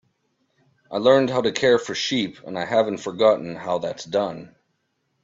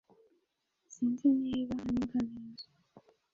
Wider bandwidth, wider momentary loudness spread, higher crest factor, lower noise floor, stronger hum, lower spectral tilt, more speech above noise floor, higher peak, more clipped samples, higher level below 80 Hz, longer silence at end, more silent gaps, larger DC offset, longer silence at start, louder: about the same, 7.8 kHz vs 7.4 kHz; second, 11 LU vs 19 LU; about the same, 18 dB vs 16 dB; second, -72 dBFS vs -81 dBFS; neither; second, -4.5 dB/octave vs -6.5 dB/octave; about the same, 51 dB vs 48 dB; first, -4 dBFS vs -18 dBFS; neither; about the same, -64 dBFS vs -64 dBFS; first, 0.75 s vs 0.35 s; neither; neither; about the same, 0.9 s vs 0.9 s; first, -22 LUFS vs -33 LUFS